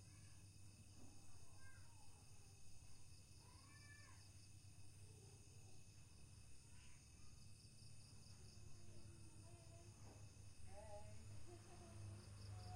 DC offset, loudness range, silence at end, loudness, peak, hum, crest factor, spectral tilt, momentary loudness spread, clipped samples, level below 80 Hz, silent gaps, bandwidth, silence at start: under 0.1%; 4 LU; 0 s; -63 LUFS; -44 dBFS; none; 14 dB; -4 dB/octave; 6 LU; under 0.1%; -70 dBFS; none; 15.5 kHz; 0 s